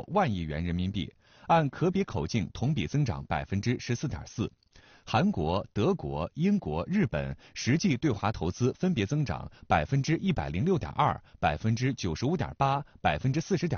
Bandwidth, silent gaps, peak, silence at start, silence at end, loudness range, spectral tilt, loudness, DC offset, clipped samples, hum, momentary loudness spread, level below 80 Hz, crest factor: 7 kHz; none; -12 dBFS; 0 s; 0 s; 2 LU; -6 dB/octave; -30 LUFS; under 0.1%; under 0.1%; none; 7 LU; -48 dBFS; 18 dB